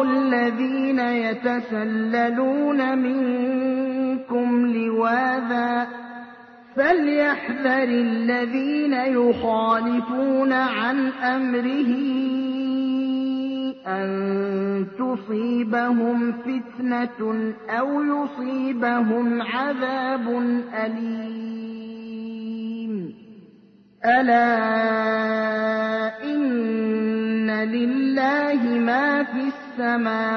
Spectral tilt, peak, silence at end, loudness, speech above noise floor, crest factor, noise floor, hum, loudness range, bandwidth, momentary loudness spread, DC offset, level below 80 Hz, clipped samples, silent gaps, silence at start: -7.5 dB/octave; -6 dBFS; 0 s; -22 LUFS; 30 dB; 16 dB; -52 dBFS; none; 4 LU; 6 kHz; 9 LU; under 0.1%; -68 dBFS; under 0.1%; none; 0 s